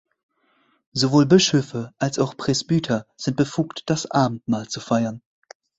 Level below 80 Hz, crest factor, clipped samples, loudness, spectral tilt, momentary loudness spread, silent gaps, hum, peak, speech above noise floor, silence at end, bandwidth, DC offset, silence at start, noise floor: -56 dBFS; 20 dB; under 0.1%; -22 LUFS; -5 dB/octave; 11 LU; none; none; -2 dBFS; 43 dB; 0.6 s; 8.2 kHz; under 0.1%; 0.95 s; -64 dBFS